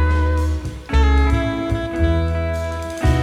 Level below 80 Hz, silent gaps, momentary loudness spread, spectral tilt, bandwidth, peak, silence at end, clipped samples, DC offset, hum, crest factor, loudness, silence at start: -20 dBFS; none; 7 LU; -7 dB/octave; 11 kHz; -6 dBFS; 0 s; under 0.1%; under 0.1%; none; 12 dB; -20 LUFS; 0 s